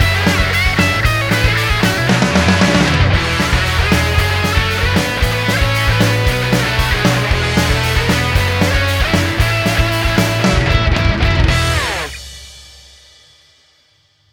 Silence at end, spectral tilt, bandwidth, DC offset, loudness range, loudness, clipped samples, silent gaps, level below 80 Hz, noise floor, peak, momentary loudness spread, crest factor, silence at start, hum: 1.65 s; -4.5 dB/octave; 19 kHz; under 0.1%; 3 LU; -14 LUFS; under 0.1%; none; -22 dBFS; -55 dBFS; 0 dBFS; 3 LU; 14 dB; 0 s; none